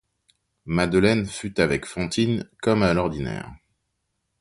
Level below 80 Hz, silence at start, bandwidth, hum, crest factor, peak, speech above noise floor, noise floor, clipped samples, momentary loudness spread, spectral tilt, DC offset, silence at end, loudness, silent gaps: -46 dBFS; 0.65 s; 11.5 kHz; none; 20 dB; -4 dBFS; 54 dB; -76 dBFS; under 0.1%; 11 LU; -6 dB/octave; under 0.1%; 0.85 s; -23 LUFS; none